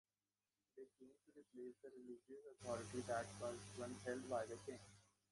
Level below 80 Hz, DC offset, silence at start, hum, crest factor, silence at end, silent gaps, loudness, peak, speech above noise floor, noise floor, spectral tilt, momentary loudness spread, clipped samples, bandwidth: -78 dBFS; under 0.1%; 0.75 s; none; 18 dB; 0.25 s; none; -51 LUFS; -34 dBFS; over 39 dB; under -90 dBFS; -4.5 dB/octave; 19 LU; under 0.1%; 11.5 kHz